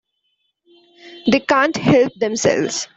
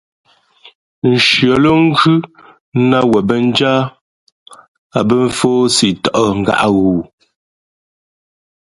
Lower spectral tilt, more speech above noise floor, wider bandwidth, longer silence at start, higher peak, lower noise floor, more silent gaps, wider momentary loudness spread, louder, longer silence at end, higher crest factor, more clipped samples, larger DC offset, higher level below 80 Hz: about the same, -4.5 dB/octave vs -5 dB/octave; first, 53 dB vs 34 dB; second, 8.2 kHz vs 11.5 kHz; about the same, 1.05 s vs 1.05 s; about the same, -2 dBFS vs 0 dBFS; first, -70 dBFS vs -46 dBFS; second, none vs 2.61-2.72 s, 4.01-4.46 s, 4.68-4.90 s; second, 5 LU vs 9 LU; second, -17 LUFS vs -12 LUFS; second, 0.1 s vs 1.65 s; about the same, 16 dB vs 14 dB; neither; neither; second, -54 dBFS vs -46 dBFS